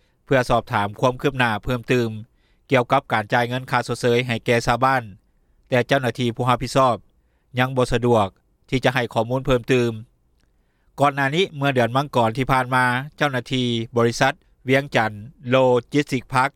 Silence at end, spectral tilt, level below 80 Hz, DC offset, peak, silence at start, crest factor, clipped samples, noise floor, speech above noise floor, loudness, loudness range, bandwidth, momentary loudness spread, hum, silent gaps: 0.05 s; -5.5 dB/octave; -44 dBFS; under 0.1%; -4 dBFS; 0.3 s; 18 dB; under 0.1%; -62 dBFS; 42 dB; -21 LUFS; 1 LU; 15 kHz; 5 LU; none; none